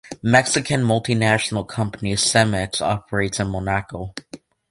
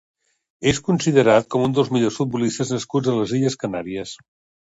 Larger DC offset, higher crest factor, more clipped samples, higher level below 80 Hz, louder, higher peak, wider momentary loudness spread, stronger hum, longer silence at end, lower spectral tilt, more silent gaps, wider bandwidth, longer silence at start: neither; about the same, 20 dB vs 20 dB; neither; first, -44 dBFS vs -52 dBFS; about the same, -20 LUFS vs -20 LUFS; about the same, 0 dBFS vs -2 dBFS; about the same, 10 LU vs 12 LU; neither; second, 0.35 s vs 0.5 s; second, -4 dB/octave vs -5.5 dB/octave; neither; first, 11.5 kHz vs 8 kHz; second, 0.05 s vs 0.6 s